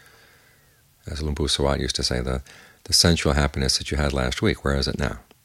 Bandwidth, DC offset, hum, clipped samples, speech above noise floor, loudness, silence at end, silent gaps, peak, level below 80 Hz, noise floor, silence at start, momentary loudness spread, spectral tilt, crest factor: 15.5 kHz; under 0.1%; none; under 0.1%; 35 dB; -22 LUFS; 0.25 s; none; -2 dBFS; -32 dBFS; -58 dBFS; 1.05 s; 12 LU; -4 dB/octave; 22 dB